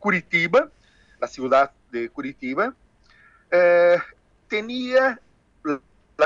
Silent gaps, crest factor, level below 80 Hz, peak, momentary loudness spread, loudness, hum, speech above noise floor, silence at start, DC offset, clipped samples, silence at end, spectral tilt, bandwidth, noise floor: none; 18 dB; -62 dBFS; -6 dBFS; 15 LU; -22 LUFS; none; 35 dB; 0 s; under 0.1%; under 0.1%; 0 s; -5.5 dB/octave; 7.4 kHz; -55 dBFS